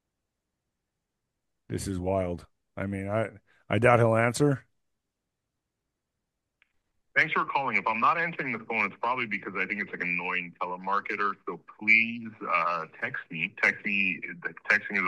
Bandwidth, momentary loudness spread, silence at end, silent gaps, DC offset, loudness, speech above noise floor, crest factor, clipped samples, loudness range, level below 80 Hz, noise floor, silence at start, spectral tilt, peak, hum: 12.5 kHz; 13 LU; 0 s; none; under 0.1%; -27 LUFS; 56 dB; 24 dB; under 0.1%; 6 LU; -62 dBFS; -84 dBFS; 1.7 s; -5.5 dB/octave; -6 dBFS; none